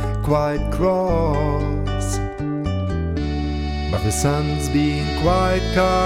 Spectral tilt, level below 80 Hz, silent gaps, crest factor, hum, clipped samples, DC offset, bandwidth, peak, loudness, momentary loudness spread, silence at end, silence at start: -6 dB/octave; -26 dBFS; none; 14 dB; none; under 0.1%; under 0.1%; 16 kHz; -4 dBFS; -21 LUFS; 6 LU; 0 s; 0 s